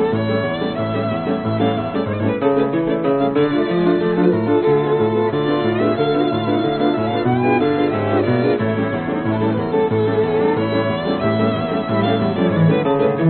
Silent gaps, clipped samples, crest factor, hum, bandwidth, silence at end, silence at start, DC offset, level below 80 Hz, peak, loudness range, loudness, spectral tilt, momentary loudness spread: none; under 0.1%; 16 dB; none; 4.5 kHz; 0 s; 0 s; under 0.1%; -48 dBFS; -2 dBFS; 2 LU; -18 LUFS; -6 dB/octave; 5 LU